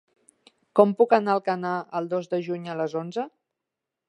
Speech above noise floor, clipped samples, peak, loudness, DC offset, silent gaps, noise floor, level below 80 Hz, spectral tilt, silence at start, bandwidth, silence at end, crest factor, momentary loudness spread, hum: 62 dB; under 0.1%; -2 dBFS; -25 LUFS; under 0.1%; none; -86 dBFS; -82 dBFS; -7.5 dB/octave; 0.75 s; 11 kHz; 0.8 s; 22 dB; 12 LU; none